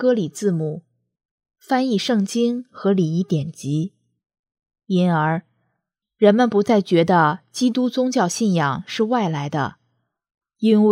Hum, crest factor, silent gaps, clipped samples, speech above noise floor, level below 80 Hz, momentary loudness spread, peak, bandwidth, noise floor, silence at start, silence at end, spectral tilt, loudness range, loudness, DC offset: none; 18 dB; 1.25-1.38 s, 4.39-4.44 s; under 0.1%; 58 dB; -66 dBFS; 8 LU; -2 dBFS; 15 kHz; -77 dBFS; 0 s; 0 s; -6 dB/octave; 4 LU; -20 LUFS; under 0.1%